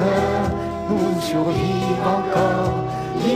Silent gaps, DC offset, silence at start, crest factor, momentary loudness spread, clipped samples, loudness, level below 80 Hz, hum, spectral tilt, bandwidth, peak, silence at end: none; under 0.1%; 0 s; 12 dB; 5 LU; under 0.1%; -21 LUFS; -40 dBFS; none; -6.5 dB/octave; 15.5 kHz; -8 dBFS; 0 s